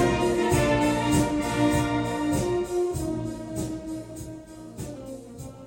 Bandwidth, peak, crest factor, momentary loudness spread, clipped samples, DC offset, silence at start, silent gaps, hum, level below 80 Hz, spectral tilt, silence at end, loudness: 16.5 kHz; -10 dBFS; 16 dB; 17 LU; under 0.1%; under 0.1%; 0 s; none; none; -42 dBFS; -5.5 dB/octave; 0 s; -25 LUFS